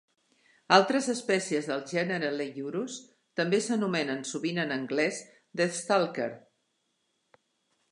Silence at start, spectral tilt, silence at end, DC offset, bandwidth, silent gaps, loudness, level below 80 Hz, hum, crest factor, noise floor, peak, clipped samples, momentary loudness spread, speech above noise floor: 0.7 s; -4 dB/octave; 1.55 s; under 0.1%; 11.5 kHz; none; -29 LUFS; -82 dBFS; none; 26 dB; -77 dBFS; -4 dBFS; under 0.1%; 12 LU; 48 dB